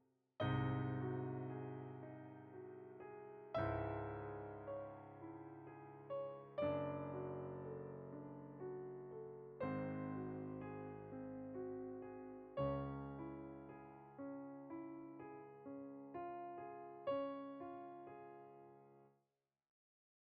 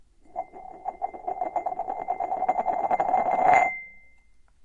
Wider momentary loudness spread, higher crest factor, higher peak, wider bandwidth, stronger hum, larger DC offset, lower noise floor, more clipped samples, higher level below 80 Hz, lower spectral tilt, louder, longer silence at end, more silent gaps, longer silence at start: second, 13 LU vs 18 LU; about the same, 20 dB vs 22 dB; second, -28 dBFS vs -6 dBFS; second, 4.8 kHz vs 7.2 kHz; neither; neither; first, -90 dBFS vs -55 dBFS; neither; second, -70 dBFS vs -58 dBFS; first, -7 dB/octave vs -5 dB/octave; second, -49 LUFS vs -26 LUFS; first, 1.2 s vs 0.65 s; neither; about the same, 0.4 s vs 0.3 s